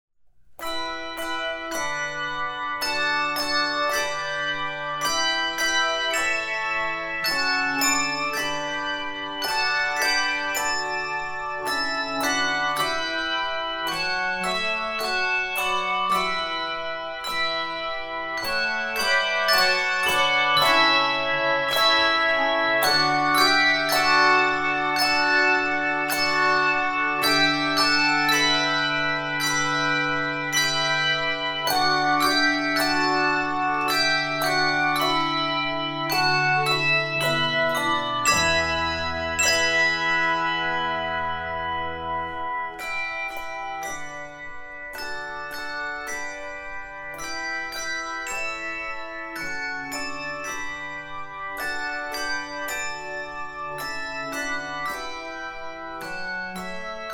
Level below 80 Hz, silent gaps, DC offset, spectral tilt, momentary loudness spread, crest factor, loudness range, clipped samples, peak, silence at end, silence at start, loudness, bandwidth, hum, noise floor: -52 dBFS; none; under 0.1%; -2 dB/octave; 13 LU; 18 dB; 11 LU; under 0.1%; -6 dBFS; 0 s; 0.5 s; -23 LUFS; 18 kHz; none; -51 dBFS